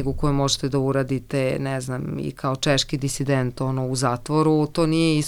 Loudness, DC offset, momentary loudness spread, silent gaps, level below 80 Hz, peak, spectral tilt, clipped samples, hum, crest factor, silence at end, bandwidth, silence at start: -23 LUFS; under 0.1%; 7 LU; none; -40 dBFS; -6 dBFS; -5.5 dB/octave; under 0.1%; none; 16 dB; 0 s; 15 kHz; 0 s